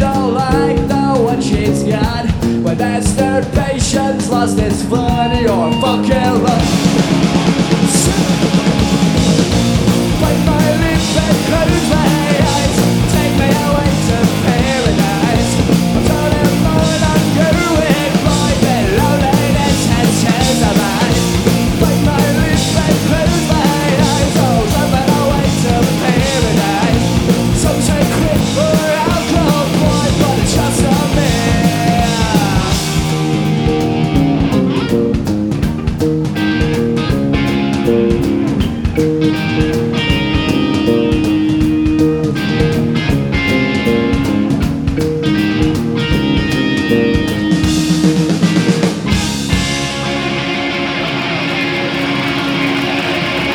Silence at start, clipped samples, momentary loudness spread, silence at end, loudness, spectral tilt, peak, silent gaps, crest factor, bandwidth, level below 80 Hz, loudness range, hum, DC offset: 0 s; under 0.1%; 3 LU; 0 s; -13 LUFS; -5.5 dB/octave; 0 dBFS; none; 12 dB; over 20 kHz; -26 dBFS; 2 LU; none; under 0.1%